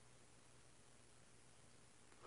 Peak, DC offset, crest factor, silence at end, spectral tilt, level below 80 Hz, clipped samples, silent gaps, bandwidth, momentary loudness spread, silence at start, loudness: -46 dBFS; under 0.1%; 22 dB; 0 s; -3 dB/octave; -82 dBFS; under 0.1%; none; 11 kHz; 0 LU; 0 s; -68 LUFS